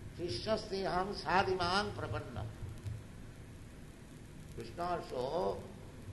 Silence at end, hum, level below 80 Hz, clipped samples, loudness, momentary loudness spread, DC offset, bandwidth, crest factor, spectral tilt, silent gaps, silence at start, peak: 0 s; none; -54 dBFS; under 0.1%; -37 LUFS; 20 LU; under 0.1%; 12 kHz; 24 dB; -5.5 dB/octave; none; 0 s; -16 dBFS